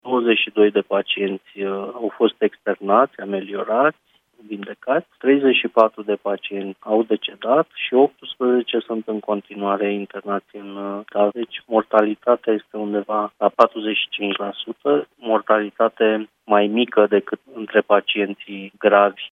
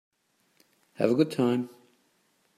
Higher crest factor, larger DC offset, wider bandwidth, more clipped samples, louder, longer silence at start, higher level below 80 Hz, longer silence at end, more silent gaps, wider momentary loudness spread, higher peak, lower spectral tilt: about the same, 20 dB vs 22 dB; neither; second, 5.4 kHz vs 14.5 kHz; neither; first, -20 LUFS vs -27 LUFS; second, 0.05 s vs 1 s; about the same, -76 dBFS vs -78 dBFS; second, 0.05 s vs 0.9 s; neither; first, 11 LU vs 8 LU; first, 0 dBFS vs -8 dBFS; about the same, -7 dB/octave vs -7 dB/octave